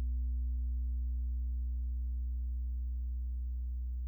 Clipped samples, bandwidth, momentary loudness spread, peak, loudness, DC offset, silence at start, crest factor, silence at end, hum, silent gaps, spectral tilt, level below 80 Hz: under 0.1%; 0.3 kHz; 3 LU; -30 dBFS; -39 LUFS; under 0.1%; 0 s; 6 dB; 0 s; none; none; -11.5 dB/octave; -36 dBFS